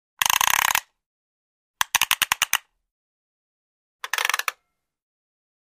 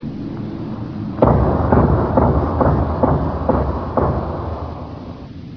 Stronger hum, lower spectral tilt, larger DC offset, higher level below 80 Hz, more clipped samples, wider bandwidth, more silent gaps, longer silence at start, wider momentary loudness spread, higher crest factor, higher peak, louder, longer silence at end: neither; second, 2.5 dB/octave vs -11 dB/octave; neither; second, -62 dBFS vs -26 dBFS; neither; first, 16 kHz vs 5.4 kHz; first, 1.06-1.74 s, 2.91-3.99 s vs none; first, 0.2 s vs 0 s; second, 10 LU vs 14 LU; first, 26 dB vs 18 dB; about the same, -2 dBFS vs 0 dBFS; second, -21 LUFS vs -18 LUFS; first, 1.2 s vs 0 s